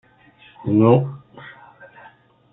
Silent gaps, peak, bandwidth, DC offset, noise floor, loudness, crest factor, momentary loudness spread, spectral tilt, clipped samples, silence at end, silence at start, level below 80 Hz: none; -2 dBFS; 4 kHz; under 0.1%; -51 dBFS; -18 LUFS; 20 dB; 26 LU; -13 dB/octave; under 0.1%; 1 s; 0.65 s; -60 dBFS